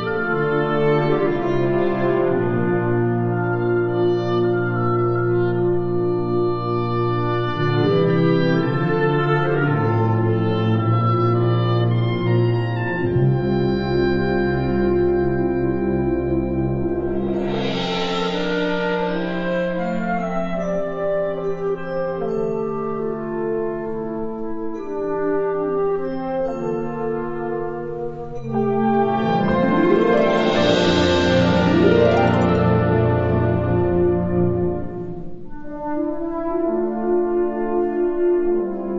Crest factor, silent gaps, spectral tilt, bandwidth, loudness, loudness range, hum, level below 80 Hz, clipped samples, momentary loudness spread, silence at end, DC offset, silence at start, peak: 18 dB; none; -8 dB/octave; 7.6 kHz; -20 LUFS; 7 LU; none; -40 dBFS; under 0.1%; 8 LU; 0 s; under 0.1%; 0 s; -2 dBFS